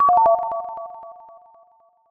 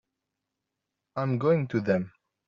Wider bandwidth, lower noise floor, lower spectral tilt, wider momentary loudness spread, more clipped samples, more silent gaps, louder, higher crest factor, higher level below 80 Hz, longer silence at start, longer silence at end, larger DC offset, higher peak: second, 3 kHz vs 7.2 kHz; second, -57 dBFS vs -85 dBFS; about the same, -7.5 dB/octave vs -8 dB/octave; first, 24 LU vs 13 LU; neither; neither; first, -19 LUFS vs -27 LUFS; about the same, 16 dB vs 20 dB; first, -60 dBFS vs -68 dBFS; second, 0 s vs 1.15 s; first, 1 s vs 0.4 s; neither; first, -6 dBFS vs -10 dBFS